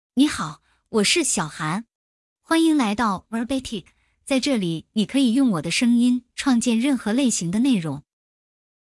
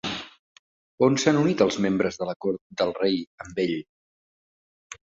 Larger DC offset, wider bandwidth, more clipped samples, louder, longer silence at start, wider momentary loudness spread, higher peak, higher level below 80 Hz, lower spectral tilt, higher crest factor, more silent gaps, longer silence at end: neither; first, 12 kHz vs 7.8 kHz; neither; first, -21 LUFS vs -25 LUFS; about the same, 0.15 s vs 0.05 s; second, 10 LU vs 13 LU; about the same, -6 dBFS vs -4 dBFS; about the same, -56 dBFS vs -60 dBFS; about the same, -4 dB/octave vs -5 dB/octave; second, 16 dB vs 22 dB; second, 1.95-2.36 s vs 0.39-0.98 s, 2.36-2.40 s, 2.61-2.70 s, 3.27-3.38 s, 3.89-4.90 s; first, 0.85 s vs 0.1 s